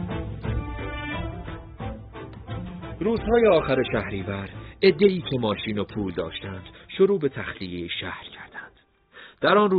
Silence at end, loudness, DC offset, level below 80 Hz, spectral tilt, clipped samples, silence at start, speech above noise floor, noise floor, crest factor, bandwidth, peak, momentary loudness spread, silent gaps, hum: 0 s; -25 LUFS; under 0.1%; -42 dBFS; -4.5 dB/octave; under 0.1%; 0 s; 33 dB; -56 dBFS; 20 dB; 5 kHz; -6 dBFS; 19 LU; none; none